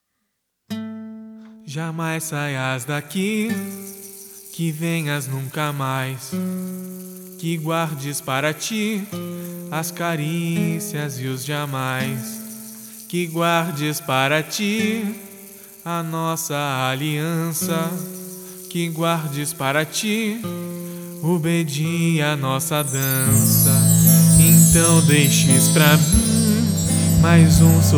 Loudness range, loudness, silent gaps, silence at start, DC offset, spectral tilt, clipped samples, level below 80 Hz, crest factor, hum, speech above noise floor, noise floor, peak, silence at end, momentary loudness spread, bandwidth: 12 LU; -19 LUFS; none; 0.7 s; under 0.1%; -4.5 dB/octave; under 0.1%; -38 dBFS; 20 dB; none; 55 dB; -74 dBFS; 0 dBFS; 0 s; 19 LU; 19.5 kHz